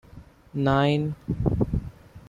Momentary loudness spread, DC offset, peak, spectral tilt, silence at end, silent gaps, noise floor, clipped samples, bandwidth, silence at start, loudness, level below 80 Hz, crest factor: 12 LU; under 0.1%; -8 dBFS; -8.5 dB/octave; 0.1 s; none; -48 dBFS; under 0.1%; 7.6 kHz; 0.15 s; -25 LUFS; -38 dBFS; 18 dB